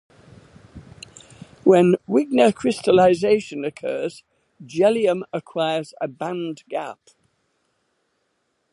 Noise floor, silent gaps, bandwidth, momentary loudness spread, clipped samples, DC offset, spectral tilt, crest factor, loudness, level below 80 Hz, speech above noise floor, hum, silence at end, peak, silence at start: -71 dBFS; none; 11.5 kHz; 16 LU; under 0.1%; under 0.1%; -6 dB/octave; 20 dB; -20 LUFS; -60 dBFS; 51 dB; none; 1.8 s; -2 dBFS; 0.75 s